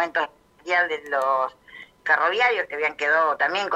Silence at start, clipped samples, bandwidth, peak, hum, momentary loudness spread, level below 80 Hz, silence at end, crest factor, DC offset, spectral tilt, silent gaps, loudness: 0 s; under 0.1%; 14.5 kHz; -6 dBFS; none; 10 LU; -68 dBFS; 0 s; 18 dB; under 0.1%; -2 dB/octave; none; -22 LUFS